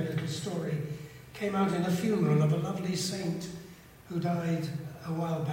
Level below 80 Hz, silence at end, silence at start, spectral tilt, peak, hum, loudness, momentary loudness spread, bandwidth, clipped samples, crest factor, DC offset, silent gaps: -64 dBFS; 0 s; 0 s; -6.5 dB/octave; -16 dBFS; none; -31 LUFS; 13 LU; 16 kHz; under 0.1%; 16 dB; under 0.1%; none